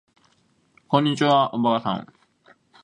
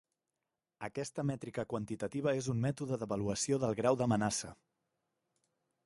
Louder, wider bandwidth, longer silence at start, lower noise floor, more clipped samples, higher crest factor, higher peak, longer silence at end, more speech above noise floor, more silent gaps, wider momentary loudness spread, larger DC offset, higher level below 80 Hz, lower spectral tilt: first, -21 LUFS vs -36 LUFS; about the same, 11 kHz vs 11.5 kHz; about the same, 0.9 s vs 0.8 s; second, -64 dBFS vs -90 dBFS; neither; about the same, 22 dB vs 20 dB; first, -2 dBFS vs -16 dBFS; second, 0.8 s vs 1.35 s; second, 43 dB vs 55 dB; neither; about the same, 9 LU vs 9 LU; neither; about the same, -66 dBFS vs -66 dBFS; about the same, -6 dB/octave vs -5.5 dB/octave